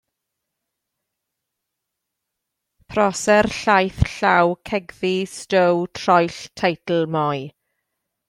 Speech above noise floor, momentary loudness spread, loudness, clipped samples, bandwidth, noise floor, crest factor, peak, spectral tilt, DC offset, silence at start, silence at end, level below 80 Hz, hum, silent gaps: 62 dB; 9 LU; -20 LUFS; under 0.1%; 13.5 kHz; -81 dBFS; 20 dB; -2 dBFS; -5 dB/octave; under 0.1%; 2.9 s; 0.8 s; -44 dBFS; none; none